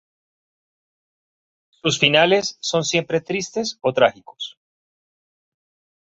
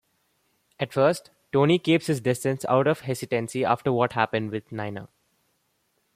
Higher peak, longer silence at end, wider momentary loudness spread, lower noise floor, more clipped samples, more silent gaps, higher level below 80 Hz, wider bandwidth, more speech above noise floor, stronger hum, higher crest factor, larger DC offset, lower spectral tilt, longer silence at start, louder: first, 0 dBFS vs -4 dBFS; first, 1.55 s vs 1.1 s; first, 18 LU vs 12 LU; first, under -90 dBFS vs -72 dBFS; neither; neither; about the same, -62 dBFS vs -66 dBFS; second, 8.2 kHz vs 15.5 kHz; first, over 70 dB vs 48 dB; neither; about the same, 22 dB vs 20 dB; neither; second, -3.5 dB/octave vs -6 dB/octave; first, 1.85 s vs 0.8 s; first, -19 LUFS vs -25 LUFS